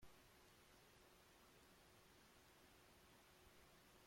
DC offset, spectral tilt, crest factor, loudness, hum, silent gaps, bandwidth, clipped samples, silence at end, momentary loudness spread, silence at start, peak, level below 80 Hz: under 0.1%; -3 dB/octave; 18 dB; -69 LUFS; none; none; 16.5 kHz; under 0.1%; 0 s; 0 LU; 0 s; -52 dBFS; -80 dBFS